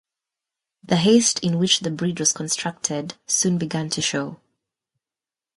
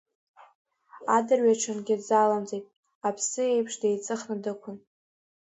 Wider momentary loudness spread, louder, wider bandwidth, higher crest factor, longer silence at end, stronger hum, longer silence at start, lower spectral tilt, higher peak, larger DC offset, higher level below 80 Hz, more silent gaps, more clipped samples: second, 9 LU vs 14 LU; first, -21 LUFS vs -27 LUFS; first, 11.5 kHz vs 8.2 kHz; about the same, 20 dB vs 18 dB; first, 1.25 s vs 0.8 s; neither; about the same, 0.9 s vs 0.95 s; about the same, -3.5 dB/octave vs -4 dB/octave; first, -4 dBFS vs -10 dBFS; neither; first, -62 dBFS vs -78 dBFS; second, none vs 2.76-2.83 s, 2.95-3.01 s; neither